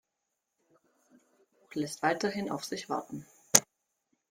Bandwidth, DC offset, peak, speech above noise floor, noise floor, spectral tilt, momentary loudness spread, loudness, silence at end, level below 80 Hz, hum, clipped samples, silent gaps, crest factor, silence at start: 16.5 kHz; under 0.1%; 0 dBFS; 51 dB; -84 dBFS; -2 dB/octave; 16 LU; -30 LUFS; 0.7 s; -72 dBFS; none; under 0.1%; none; 34 dB; 1.7 s